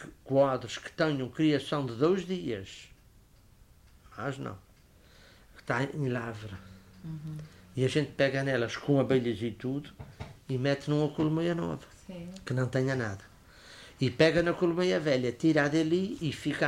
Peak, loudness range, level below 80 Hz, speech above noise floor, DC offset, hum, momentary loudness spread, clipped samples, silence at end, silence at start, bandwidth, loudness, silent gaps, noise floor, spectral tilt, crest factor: -10 dBFS; 9 LU; -58 dBFS; 29 dB; under 0.1%; none; 20 LU; under 0.1%; 0 s; 0 s; 15 kHz; -30 LUFS; none; -59 dBFS; -6.5 dB/octave; 20 dB